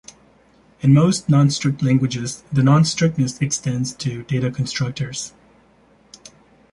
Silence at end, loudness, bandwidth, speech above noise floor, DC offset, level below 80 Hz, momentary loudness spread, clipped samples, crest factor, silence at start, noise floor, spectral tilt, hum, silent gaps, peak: 1.45 s; -19 LUFS; 11.5 kHz; 36 dB; under 0.1%; -52 dBFS; 12 LU; under 0.1%; 16 dB; 0.85 s; -54 dBFS; -5.5 dB/octave; none; none; -4 dBFS